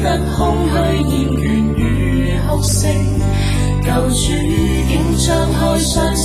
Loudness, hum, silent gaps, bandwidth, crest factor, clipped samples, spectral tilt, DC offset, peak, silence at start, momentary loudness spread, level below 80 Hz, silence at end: -15 LUFS; none; none; 15.5 kHz; 12 dB; under 0.1%; -5.5 dB/octave; under 0.1%; -4 dBFS; 0 s; 2 LU; -20 dBFS; 0 s